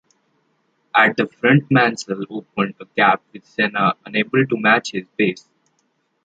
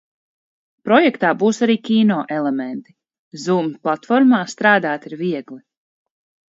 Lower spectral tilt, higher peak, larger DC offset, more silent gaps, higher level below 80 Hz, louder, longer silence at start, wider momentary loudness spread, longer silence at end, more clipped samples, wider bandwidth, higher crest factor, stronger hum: about the same, -5.5 dB/octave vs -5.5 dB/octave; about the same, -2 dBFS vs 0 dBFS; neither; second, none vs 3.19-3.31 s; first, -64 dBFS vs -70 dBFS; about the same, -18 LUFS vs -17 LUFS; about the same, 0.95 s vs 0.85 s; about the same, 12 LU vs 12 LU; about the same, 0.85 s vs 0.9 s; neither; first, 9 kHz vs 7.8 kHz; about the same, 18 dB vs 18 dB; neither